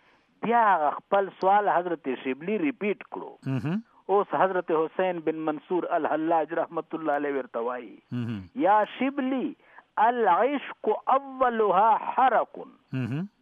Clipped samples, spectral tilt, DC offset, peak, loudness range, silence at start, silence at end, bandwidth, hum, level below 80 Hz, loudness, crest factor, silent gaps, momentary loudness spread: under 0.1%; -8.5 dB/octave; under 0.1%; -8 dBFS; 4 LU; 0.4 s; 0.15 s; 5.4 kHz; none; -74 dBFS; -26 LUFS; 18 dB; none; 12 LU